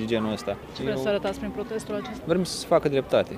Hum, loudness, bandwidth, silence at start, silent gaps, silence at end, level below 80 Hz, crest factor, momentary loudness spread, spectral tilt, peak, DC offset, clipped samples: none; -27 LUFS; 15.5 kHz; 0 s; none; 0 s; -50 dBFS; 18 dB; 9 LU; -5.5 dB/octave; -8 dBFS; under 0.1%; under 0.1%